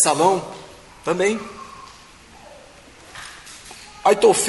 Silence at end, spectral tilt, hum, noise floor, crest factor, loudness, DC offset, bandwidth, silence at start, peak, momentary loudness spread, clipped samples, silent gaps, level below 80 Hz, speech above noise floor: 0 s; -3 dB/octave; none; -45 dBFS; 20 dB; -19 LUFS; under 0.1%; 11.5 kHz; 0 s; -2 dBFS; 27 LU; under 0.1%; none; -56 dBFS; 28 dB